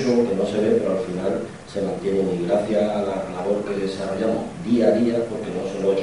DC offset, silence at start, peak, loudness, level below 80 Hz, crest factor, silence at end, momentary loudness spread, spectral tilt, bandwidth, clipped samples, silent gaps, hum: 0.2%; 0 s; -4 dBFS; -23 LUFS; -54 dBFS; 18 dB; 0 s; 8 LU; -7 dB/octave; 11 kHz; under 0.1%; none; none